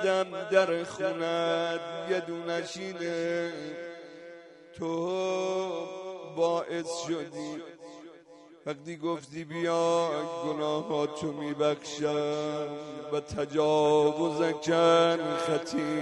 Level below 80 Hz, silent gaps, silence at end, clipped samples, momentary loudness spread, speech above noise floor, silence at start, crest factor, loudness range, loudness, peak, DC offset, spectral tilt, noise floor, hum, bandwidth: -68 dBFS; none; 0 s; under 0.1%; 15 LU; 24 dB; 0 s; 18 dB; 8 LU; -30 LUFS; -10 dBFS; under 0.1%; -5 dB/octave; -53 dBFS; none; 11.5 kHz